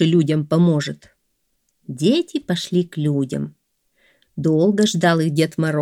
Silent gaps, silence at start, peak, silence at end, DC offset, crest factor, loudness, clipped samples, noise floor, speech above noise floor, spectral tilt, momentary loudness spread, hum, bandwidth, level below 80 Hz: none; 0 s; -4 dBFS; 0 s; under 0.1%; 16 dB; -19 LUFS; under 0.1%; -70 dBFS; 52 dB; -6 dB/octave; 13 LU; none; 13 kHz; -62 dBFS